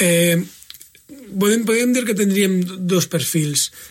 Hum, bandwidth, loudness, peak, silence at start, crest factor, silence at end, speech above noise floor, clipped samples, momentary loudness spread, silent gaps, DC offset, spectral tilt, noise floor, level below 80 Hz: none; 16.5 kHz; -18 LUFS; -4 dBFS; 0 s; 14 dB; 0 s; 25 dB; under 0.1%; 6 LU; none; under 0.1%; -4 dB/octave; -43 dBFS; -62 dBFS